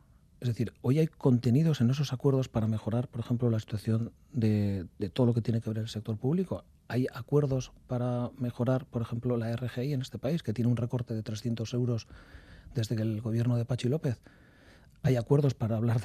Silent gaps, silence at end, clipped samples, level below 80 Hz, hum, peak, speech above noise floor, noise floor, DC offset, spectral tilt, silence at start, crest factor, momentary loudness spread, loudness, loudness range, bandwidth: none; 0 s; under 0.1%; -58 dBFS; none; -12 dBFS; 28 dB; -57 dBFS; under 0.1%; -8 dB/octave; 0.4 s; 18 dB; 9 LU; -31 LUFS; 4 LU; 13.5 kHz